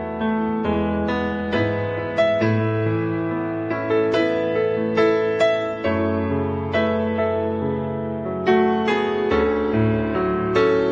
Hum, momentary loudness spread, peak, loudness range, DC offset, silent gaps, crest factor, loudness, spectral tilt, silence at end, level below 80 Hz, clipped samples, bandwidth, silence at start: none; 6 LU; -6 dBFS; 1 LU; under 0.1%; none; 14 dB; -21 LUFS; -8 dB/octave; 0 s; -44 dBFS; under 0.1%; 7.6 kHz; 0 s